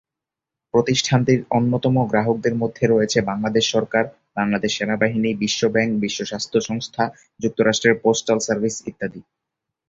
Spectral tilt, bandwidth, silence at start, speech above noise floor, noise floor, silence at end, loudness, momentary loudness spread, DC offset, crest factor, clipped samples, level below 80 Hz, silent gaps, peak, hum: -4.5 dB/octave; 8 kHz; 0.75 s; 67 dB; -86 dBFS; 0.65 s; -20 LUFS; 8 LU; under 0.1%; 18 dB; under 0.1%; -54 dBFS; none; -2 dBFS; none